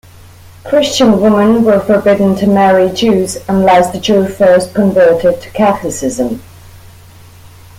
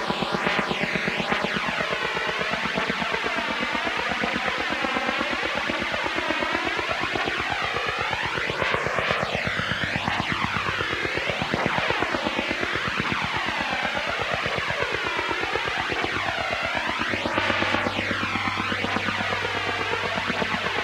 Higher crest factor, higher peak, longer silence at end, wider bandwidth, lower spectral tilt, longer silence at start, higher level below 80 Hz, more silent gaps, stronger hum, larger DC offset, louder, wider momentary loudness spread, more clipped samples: second, 10 dB vs 22 dB; first, 0 dBFS vs -4 dBFS; first, 0.3 s vs 0 s; about the same, 16 kHz vs 16 kHz; first, -5.5 dB/octave vs -4 dB/octave; first, 0.65 s vs 0 s; first, -42 dBFS vs -48 dBFS; neither; neither; neither; first, -10 LUFS vs -24 LUFS; first, 7 LU vs 2 LU; neither